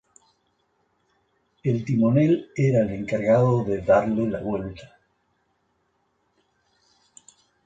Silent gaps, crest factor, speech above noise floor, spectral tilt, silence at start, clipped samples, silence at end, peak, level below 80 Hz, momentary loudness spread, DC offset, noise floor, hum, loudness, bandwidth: none; 18 dB; 49 dB; -9 dB/octave; 1.65 s; under 0.1%; 2.8 s; -8 dBFS; -54 dBFS; 11 LU; under 0.1%; -70 dBFS; none; -22 LUFS; 7.8 kHz